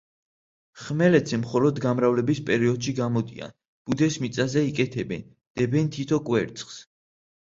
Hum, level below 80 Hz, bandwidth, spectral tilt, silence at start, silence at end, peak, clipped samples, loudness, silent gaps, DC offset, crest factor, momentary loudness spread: none; -58 dBFS; 7.8 kHz; -6.5 dB/octave; 0.75 s; 0.65 s; -6 dBFS; under 0.1%; -24 LUFS; 3.68-3.85 s, 5.47-5.55 s; under 0.1%; 20 dB; 16 LU